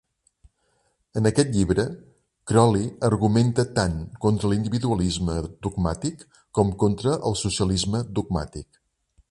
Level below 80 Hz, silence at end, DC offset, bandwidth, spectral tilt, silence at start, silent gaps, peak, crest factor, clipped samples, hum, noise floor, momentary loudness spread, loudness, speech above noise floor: -40 dBFS; 0.7 s; under 0.1%; 11.5 kHz; -6 dB/octave; 1.15 s; none; -4 dBFS; 20 dB; under 0.1%; none; -69 dBFS; 10 LU; -24 LUFS; 46 dB